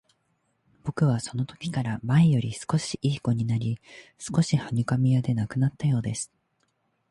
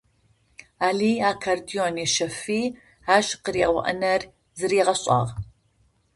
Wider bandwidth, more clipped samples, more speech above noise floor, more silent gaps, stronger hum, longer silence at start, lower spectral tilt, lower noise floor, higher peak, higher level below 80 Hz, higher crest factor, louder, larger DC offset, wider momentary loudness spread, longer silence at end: about the same, 11.5 kHz vs 11.5 kHz; neither; first, 47 dB vs 41 dB; neither; neither; about the same, 0.85 s vs 0.8 s; first, -6.5 dB/octave vs -3.5 dB/octave; first, -72 dBFS vs -64 dBFS; second, -12 dBFS vs -4 dBFS; about the same, -56 dBFS vs -54 dBFS; second, 14 dB vs 22 dB; second, -26 LUFS vs -23 LUFS; neither; about the same, 11 LU vs 10 LU; first, 0.85 s vs 0.7 s